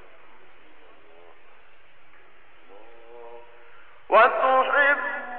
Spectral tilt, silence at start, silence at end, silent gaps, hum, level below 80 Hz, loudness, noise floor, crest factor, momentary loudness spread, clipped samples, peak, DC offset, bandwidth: -6 dB/octave; 3.15 s; 0 s; none; none; -70 dBFS; -19 LUFS; -55 dBFS; 18 dB; 21 LU; under 0.1%; -8 dBFS; 0.9%; 4.5 kHz